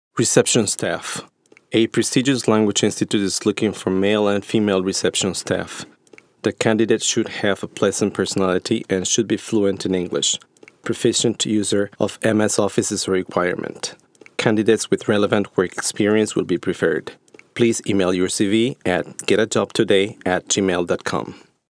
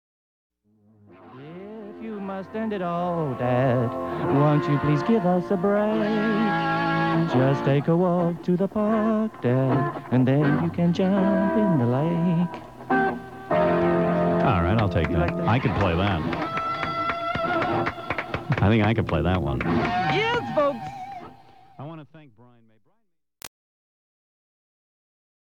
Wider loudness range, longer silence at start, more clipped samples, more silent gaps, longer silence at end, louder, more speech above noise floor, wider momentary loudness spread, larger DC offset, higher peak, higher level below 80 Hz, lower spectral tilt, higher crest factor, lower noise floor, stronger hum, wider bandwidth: second, 2 LU vs 6 LU; second, 0.15 s vs 1.2 s; neither; neither; second, 0.35 s vs 1.95 s; first, -20 LUFS vs -23 LUFS; second, 31 dB vs 50 dB; second, 8 LU vs 15 LU; second, under 0.1% vs 0.2%; first, 0 dBFS vs -8 dBFS; second, -62 dBFS vs -46 dBFS; second, -4 dB/octave vs -8 dB/octave; first, 20 dB vs 14 dB; second, -50 dBFS vs -72 dBFS; neither; about the same, 11 kHz vs 11.5 kHz